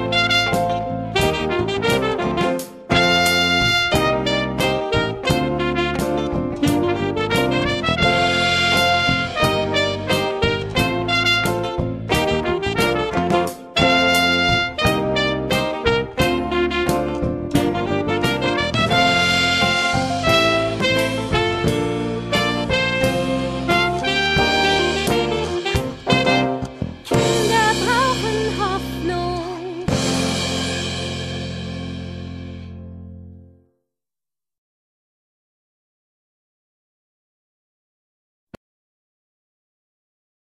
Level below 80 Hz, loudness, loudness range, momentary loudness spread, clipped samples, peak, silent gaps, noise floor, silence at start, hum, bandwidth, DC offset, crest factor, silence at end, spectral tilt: -38 dBFS; -18 LUFS; 6 LU; 9 LU; under 0.1%; -2 dBFS; none; under -90 dBFS; 0 s; none; 14 kHz; under 0.1%; 18 dB; 7.1 s; -4.5 dB/octave